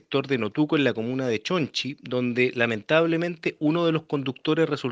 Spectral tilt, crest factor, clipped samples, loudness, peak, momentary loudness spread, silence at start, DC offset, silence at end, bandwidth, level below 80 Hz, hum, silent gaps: -6 dB/octave; 20 dB; under 0.1%; -25 LUFS; -6 dBFS; 6 LU; 0.1 s; under 0.1%; 0 s; 7.8 kHz; -70 dBFS; none; none